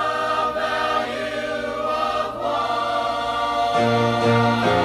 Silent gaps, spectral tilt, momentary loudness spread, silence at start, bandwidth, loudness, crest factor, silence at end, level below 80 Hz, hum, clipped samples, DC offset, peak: none; -5.5 dB/octave; 7 LU; 0 s; 14.5 kHz; -21 LUFS; 14 dB; 0 s; -50 dBFS; none; under 0.1%; under 0.1%; -6 dBFS